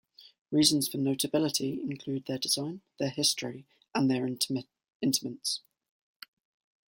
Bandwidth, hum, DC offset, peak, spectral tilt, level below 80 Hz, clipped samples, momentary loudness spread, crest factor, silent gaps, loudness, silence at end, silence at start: 16.5 kHz; none; under 0.1%; -8 dBFS; -3.5 dB/octave; -72 dBFS; under 0.1%; 11 LU; 24 dB; 0.41-0.45 s, 4.95-5.00 s; -30 LUFS; 1.3 s; 0.2 s